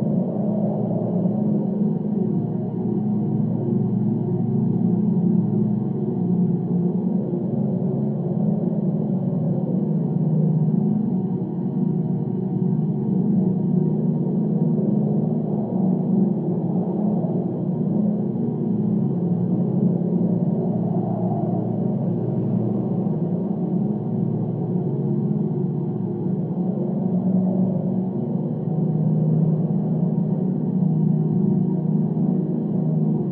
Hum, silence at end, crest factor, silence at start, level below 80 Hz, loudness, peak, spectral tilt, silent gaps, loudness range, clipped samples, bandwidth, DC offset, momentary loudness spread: none; 0 s; 12 dB; 0 s; -60 dBFS; -22 LUFS; -8 dBFS; -14 dB/octave; none; 2 LU; under 0.1%; 2 kHz; under 0.1%; 4 LU